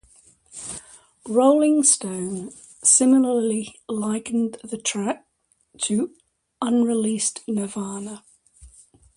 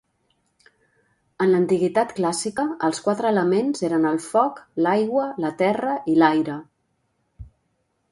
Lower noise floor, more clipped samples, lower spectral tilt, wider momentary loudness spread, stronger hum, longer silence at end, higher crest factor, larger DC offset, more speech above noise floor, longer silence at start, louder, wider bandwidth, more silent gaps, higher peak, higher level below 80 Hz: second, -64 dBFS vs -71 dBFS; neither; second, -3.5 dB/octave vs -5.5 dB/octave; first, 18 LU vs 6 LU; neither; second, 0.5 s vs 0.65 s; about the same, 20 dB vs 22 dB; neither; second, 42 dB vs 50 dB; second, 0.55 s vs 1.4 s; about the same, -21 LUFS vs -21 LUFS; about the same, 11.5 kHz vs 11.5 kHz; neither; about the same, -4 dBFS vs -2 dBFS; about the same, -62 dBFS vs -58 dBFS